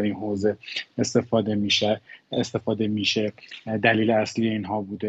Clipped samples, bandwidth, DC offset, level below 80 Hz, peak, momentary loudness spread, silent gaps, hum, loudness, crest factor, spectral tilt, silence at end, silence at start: under 0.1%; 8.2 kHz; under 0.1%; -62 dBFS; -4 dBFS; 10 LU; none; none; -24 LUFS; 20 dB; -5 dB/octave; 0 s; 0 s